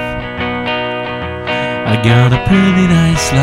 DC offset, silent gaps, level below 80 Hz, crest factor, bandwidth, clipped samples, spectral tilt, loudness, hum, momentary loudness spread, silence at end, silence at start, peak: under 0.1%; none; -30 dBFS; 12 dB; 14 kHz; under 0.1%; -5.5 dB/octave; -13 LUFS; none; 10 LU; 0 s; 0 s; 0 dBFS